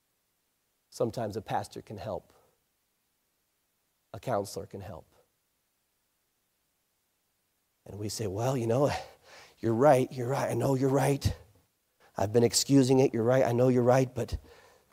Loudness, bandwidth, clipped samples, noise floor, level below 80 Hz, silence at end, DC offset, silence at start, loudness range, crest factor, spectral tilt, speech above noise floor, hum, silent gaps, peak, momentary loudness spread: -28 LUFS; 16 kHz; under 0.1%; -77 dBFS; -54 dBFS; 0.55 s; under 0.1%; 0.95 s; 15 LU; 20 dB; -5.5 dB/octave; 49 dB; none; none; -10 dBFS; 18 LU